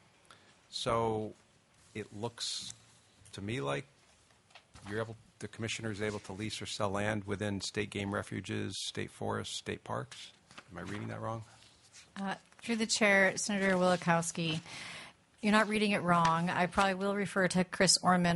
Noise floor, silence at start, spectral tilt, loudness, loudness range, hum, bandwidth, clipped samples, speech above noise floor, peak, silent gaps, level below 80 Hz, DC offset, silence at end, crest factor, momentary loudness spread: -65 dBFS; 0.7 s; -4 dB/octave; -33 LUFS; 11 LU; none; 11.5 kHz; under 0.1%; 32 dB; -12 dBFS; none; -64 dBFS; under 0.1%; 0 s; 22 dB; 18 LU